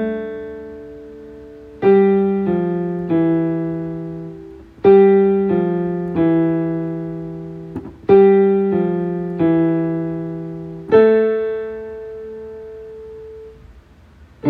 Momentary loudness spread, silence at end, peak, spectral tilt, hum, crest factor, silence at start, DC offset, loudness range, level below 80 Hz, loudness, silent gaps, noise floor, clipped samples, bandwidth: 23 LU; 0 s; 0 dBFS; -10.5 dB/octave; none; 16 dB; 0 s; under 0.1%; 3 LU; -50 dBFS; -16 LUFS; none; -46 dBFS; under 0.1%; 4.3 kHz